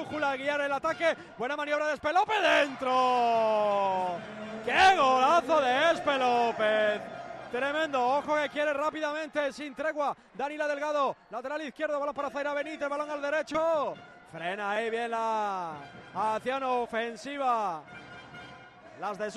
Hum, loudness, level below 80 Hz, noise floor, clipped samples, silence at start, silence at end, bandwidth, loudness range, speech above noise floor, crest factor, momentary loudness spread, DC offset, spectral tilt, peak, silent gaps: none; -29 LUFS; -66 dBFS; -50 dBFS; under 0.1%; 0 s; 0 s; 12.5 kHz; 7 LU; 21 dB; 18 dB; 14 LU; under 0.1%; -3.5 dB/octave; -10 dBFS; none